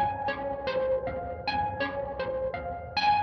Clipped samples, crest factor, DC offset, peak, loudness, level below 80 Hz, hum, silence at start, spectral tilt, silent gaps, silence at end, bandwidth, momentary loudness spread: under 0.1%; 16 dB; under 0.1%; -14 dBFS; -31 LUFS; -50 dBFS; none; 0 s; -5.5 dB/octave; none; 0 s; 6.2 kHz; 5 LU